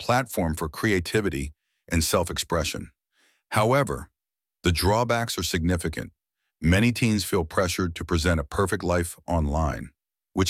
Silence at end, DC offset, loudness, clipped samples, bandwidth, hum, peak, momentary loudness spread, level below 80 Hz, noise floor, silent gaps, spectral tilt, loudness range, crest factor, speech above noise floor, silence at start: 0 s; under 0.1%; -25 LUFS; under 0.1%; 16.5 kHz; none; -6 dBFS; 12 LU; -38 dBFS; under -90 dBFS; none; -5 dB/octave; 2 LU; 20 dB; over 66 dB; 0 s